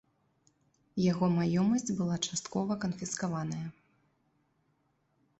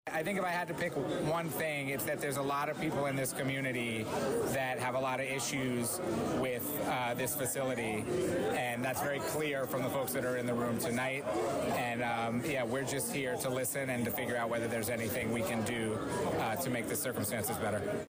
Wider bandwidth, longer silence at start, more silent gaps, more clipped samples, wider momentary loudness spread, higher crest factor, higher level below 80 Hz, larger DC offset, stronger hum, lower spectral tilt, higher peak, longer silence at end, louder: second, 8.4 kHz vs 16 kHz; first, 0.95 s vs 0.05 s; neither; neither; first, 10 LU vs 1 LU; first, 18 dB vs 10 dB; about the same, -66 dBFS vs -64 dBFS; neither; neither; about the same, -5.5 dB/octave vs -4.5 dB/octave; first, -16 dBFS vs -24 dBFS; first, 1.7 s vs 0 s; about the same, -32 LUFS vs -34 LUFS